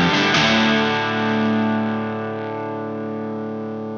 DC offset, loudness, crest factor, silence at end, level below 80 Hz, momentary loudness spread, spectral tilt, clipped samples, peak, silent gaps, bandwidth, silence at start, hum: under 0.1%; -20 LUFS; 16 dB; 0 s; -54 dBFS; 12 LU; -5 dB/octave; under 0.1%; -4 dBFS; none; 7.4 kHz; 0 s; none